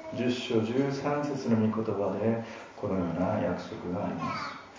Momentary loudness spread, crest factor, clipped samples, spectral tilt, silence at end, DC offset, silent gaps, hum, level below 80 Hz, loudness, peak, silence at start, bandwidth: 8 LU; 16 dB; under 0.1%; -7 dB/octave; 0 s; under 0.1%; none; none; -58 dBFS; -30 LUFS; -14 dBFS; 0 s; 7.6 kHz